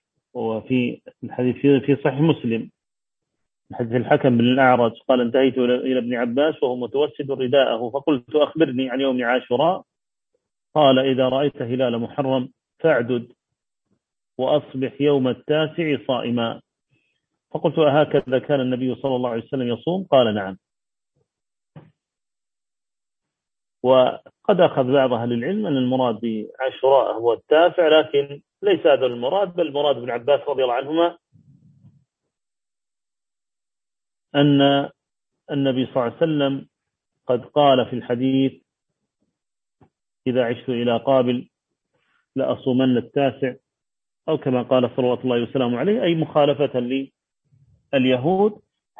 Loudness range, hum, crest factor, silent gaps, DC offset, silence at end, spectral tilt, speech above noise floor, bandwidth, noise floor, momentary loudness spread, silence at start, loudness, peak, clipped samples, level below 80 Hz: 5 LU; none; 20 dB; none; under 0.1%; 0.45 s; -9 dB/octave; over 70 dB; 3.8 kHz; under -90 dBFS; 10 LU; 0.35 s; -20 LUFS; -2 dBFS; under 0.1%; -66 dBFS